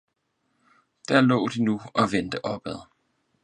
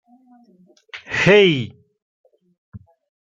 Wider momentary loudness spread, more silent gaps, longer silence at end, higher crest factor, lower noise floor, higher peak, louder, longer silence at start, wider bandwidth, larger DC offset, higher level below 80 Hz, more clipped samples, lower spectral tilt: second, 17 LU vs 25 LU; second, none vs 2.02-2.24 s, 2.58-2.72 s; about the same, 0.6 s vs 0.65 s; about the same, 22 dB vs 20 dB; first, -74 dBFS vs -52 dBFS; about the same, -4 dBFS vs -2 dBFS; second, -24 LUFS vs -15 LUFS; first, 1.1 s vs 0.95 s; first, 10 kHz vs 7.6 kHz; neither; second, -60 dBFS vs -54 dBFS; neither; about the same, -6 dB/octave vs -5.5 dB/octave